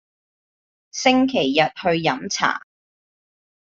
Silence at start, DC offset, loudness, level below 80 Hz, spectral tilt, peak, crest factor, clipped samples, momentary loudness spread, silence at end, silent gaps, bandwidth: 0.95 s; under 0.1%; -20 LUFS; -60 dBFS; -3.5 dB/octave; -2 dBFS; 20 dB; under 0.1%; 6 LU; 1 s; none; 7.8 kHz